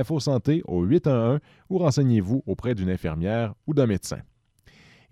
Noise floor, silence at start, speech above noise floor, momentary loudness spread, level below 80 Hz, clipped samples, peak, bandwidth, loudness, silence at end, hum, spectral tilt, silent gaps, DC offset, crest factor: -57 dBFS; 0 s; 34 dB; 8 LU; -48 dBFS; under 0.1%; -8 dBFS; 13.5 kHz; -24 LUFS; 0.95 s; none; -7.5 dB/octave; none; under 0.1%; 16 dB